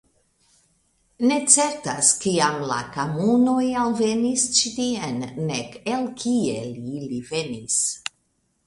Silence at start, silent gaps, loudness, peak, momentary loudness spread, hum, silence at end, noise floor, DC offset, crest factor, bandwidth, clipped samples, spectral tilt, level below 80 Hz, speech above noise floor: 1.2 s; none; -22 LUFS; -2 dBFS; 12 LU; none; 0.65 s; -69 dBFS; under 0.1%; 22 dB; 11.5 kHz; under 0.1%; -3 dB/octave; -60 dBFS; 47 dB